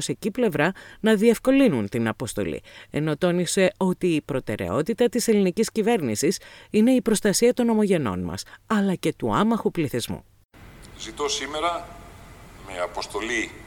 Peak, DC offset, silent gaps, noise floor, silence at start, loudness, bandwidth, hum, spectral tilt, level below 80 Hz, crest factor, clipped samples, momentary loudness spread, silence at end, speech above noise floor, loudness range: -6 dBFS; under 0.1%; 10.45-10.49 s; -45 dBFS; 0 s; -23 LUFS; 18 kHz; none; -5 dB/octave; -52 dBFS; 18 dB; under 0.1%; 12 LU; 0 s; 22 dB; 7 LU